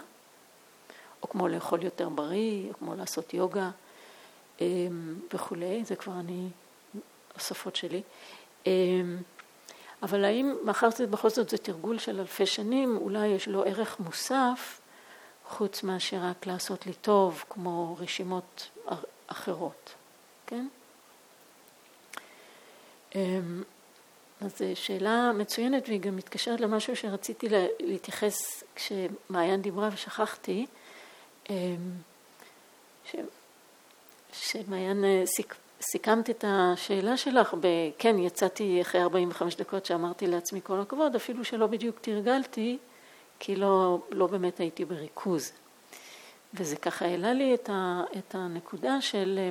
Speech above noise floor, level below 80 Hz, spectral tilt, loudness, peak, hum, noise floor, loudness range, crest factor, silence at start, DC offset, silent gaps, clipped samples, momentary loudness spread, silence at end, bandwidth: 28 dB; -84 dBFS; -4.5 dB/octave; -30 LUFS; -6 dBFS; none; -58 dBFS; 12 LU; 24 dB; 0 s; under 0.1%; none; under 0.1%; 18 LU; 0 s; 18.5 kHz